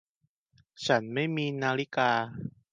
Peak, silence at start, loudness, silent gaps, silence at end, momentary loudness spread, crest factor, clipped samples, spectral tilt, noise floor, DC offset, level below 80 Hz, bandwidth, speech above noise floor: -10 dBFS; 0.8 s; -29 LUFS; none; 0.25 s; 10 LU; 22 dB; under 0.1%; -5.5 dB/octave; -76 dBFS; under 0.1%; -70 dBFS; 9.8 kHz; 47 dB